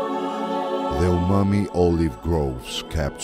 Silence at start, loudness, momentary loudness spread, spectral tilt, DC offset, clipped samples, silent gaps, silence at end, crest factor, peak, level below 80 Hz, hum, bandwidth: 0 s; -23 LUFS; 7 LU; -7 dB/octave; under 0.1%; under 0.1%; none; 0 s; 16 dB; -6 dBFS; -34 dBFS; none; 15 kHz